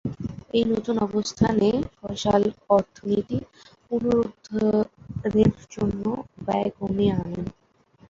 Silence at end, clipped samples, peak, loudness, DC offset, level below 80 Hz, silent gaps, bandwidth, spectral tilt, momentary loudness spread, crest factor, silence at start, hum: 0.6 s; under 0.1%; -6 dBFS; -25 LUFS; under 0.1%; -48 dBFS; none; 7.6 kHz; -7 dB/octave; 10 LU; 18 dB; 0.05 s; none